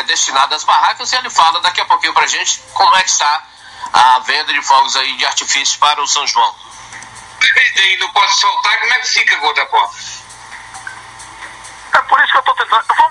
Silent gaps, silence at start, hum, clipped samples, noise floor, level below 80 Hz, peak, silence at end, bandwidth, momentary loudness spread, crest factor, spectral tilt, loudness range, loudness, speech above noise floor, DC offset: none; 0 s; none; under 0.1%; -33 dBFS; -56 dBFS; 0 dBFS; 0 s; 11.5 kHz; 20 LU; 14 dB; 2 dB/octave; 4 LU; -11 LUFS; 21 dB; under 0.1%